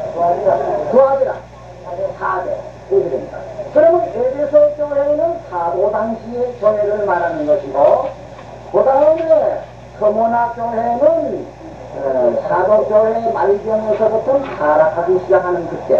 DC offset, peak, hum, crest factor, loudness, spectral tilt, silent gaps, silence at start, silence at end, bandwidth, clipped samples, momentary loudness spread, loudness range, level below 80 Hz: 0.2%; 0 dBFS; none; 14 dB; -15 LUFS; -7.5 dB/octave; none; 0 s; 0 s; 7.2 kHz; under 0.1%; 13 LU; 3 LU; -46 dBFS